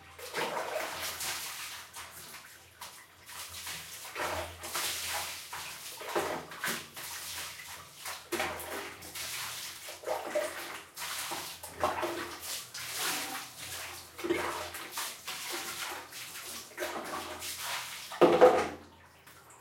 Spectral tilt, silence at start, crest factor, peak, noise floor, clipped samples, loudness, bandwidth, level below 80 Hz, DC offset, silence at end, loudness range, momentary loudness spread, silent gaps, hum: -2 dB/octave; 0 s; 28 dB; -8 dBFS; -56 dBFS; under 0.1%; -35 LUFS; 16.5 kHz; -72 dBFS; under 0.1%; 0 s; 8 LU; 11 LU; none; none